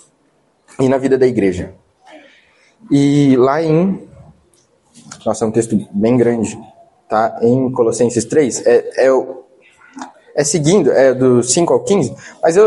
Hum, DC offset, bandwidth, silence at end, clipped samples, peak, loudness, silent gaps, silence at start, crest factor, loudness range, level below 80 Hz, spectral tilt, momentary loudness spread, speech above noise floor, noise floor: none; under 0.1%; 11.5 kHz; 0 s; under 0.1%; 0 dBFS; -14 LUFS; none; 0.8 s; 14 dB; 3 LU; -54 dBFS; -5.5 dB/octave; 13 LU; 45 dB; -58 dBFS